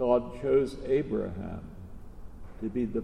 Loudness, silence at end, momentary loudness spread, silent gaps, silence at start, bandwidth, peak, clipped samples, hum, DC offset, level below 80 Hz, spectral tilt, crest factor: -30 LUFS; 0 s; 23 LU; none; 0 s; 10.5 kHz; -12 dBFS; under 0.1%; none; under 0.1%; -46 dBFS; -8 dB/octave; 18 dB